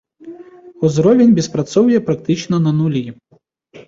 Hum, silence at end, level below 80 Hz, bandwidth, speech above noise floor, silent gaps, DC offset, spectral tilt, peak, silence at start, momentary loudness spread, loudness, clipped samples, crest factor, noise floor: none; 0.1 s; -54 dBFS; 7.8 kHz; 42 dB; none; under 0.1%; -7 dB/octave; -2 dBFS; 0.25 s; 10 LU; -15 LUFS; under 0.1%; 14 dB; -55 dBFS